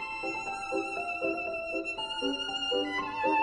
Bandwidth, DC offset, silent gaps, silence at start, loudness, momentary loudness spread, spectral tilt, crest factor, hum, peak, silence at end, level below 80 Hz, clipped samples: 11.5 kHz; under 0.1%; none; 0 s; -32 LUFS; 4 LU; -3 dB/octave; 16 dB; none; -16 dBFS; 0 s; -60 dBFS; under 0.1%